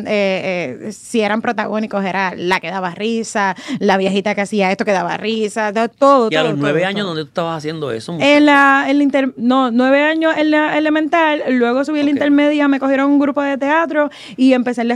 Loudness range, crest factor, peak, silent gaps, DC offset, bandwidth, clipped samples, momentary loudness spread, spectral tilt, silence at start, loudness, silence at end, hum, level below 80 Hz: 5 LU; 14 dB; 0 dBFS; none; under 0.1%; 11 kHz; under 0.1%; 9 LU; -5 dB/octave; 0 s; -15 LUFS; 0 s; none; -62 dBFS